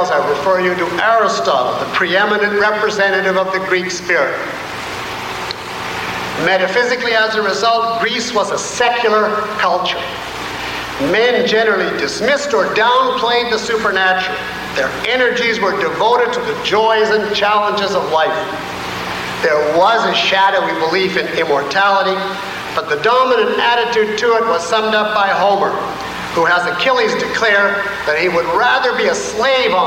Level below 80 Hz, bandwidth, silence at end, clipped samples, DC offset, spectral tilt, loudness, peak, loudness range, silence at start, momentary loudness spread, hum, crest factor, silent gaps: -48 dBFS; 16.5 kHz; 0 s; under 0.1%; under 0.1%; -3 dB/octave; -15 LUFS; -4 dBFS; 2 LU; 0 s; 9 LU; none; 12 dB; none